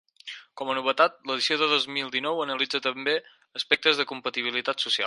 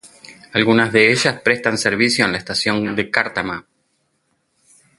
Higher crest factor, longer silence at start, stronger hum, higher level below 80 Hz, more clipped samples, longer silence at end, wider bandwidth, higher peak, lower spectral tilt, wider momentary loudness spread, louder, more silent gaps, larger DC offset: about the same, 22 dB vs 20 dB; first, 0.25 s vs 0.05 s; neither; second, -74 dBFS vs -54 dBFS; neither; second, 0 s vs 1.4 s; about the same, 11.5 kHz vs 11.5 kHz; second, -4 dBFS vs 0 dBFS; second, -2 dB/octave vs -4 dB/octave; first, 12 LU vs 9 LU; second, -25 LUFS vs -17 LUFS; neither; neither